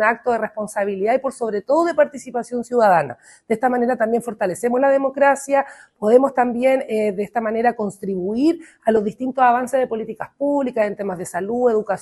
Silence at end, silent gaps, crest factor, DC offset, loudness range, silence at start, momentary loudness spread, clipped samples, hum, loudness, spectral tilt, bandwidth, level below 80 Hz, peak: 0 s; none; 18 dB; under 0.1%; 2 LU; 0 s; 9 LU; under 0.1%; none; -20 LUFS; -5.5 dB/octave; 12.5 kHz; -62 dBFS; -2 dBFS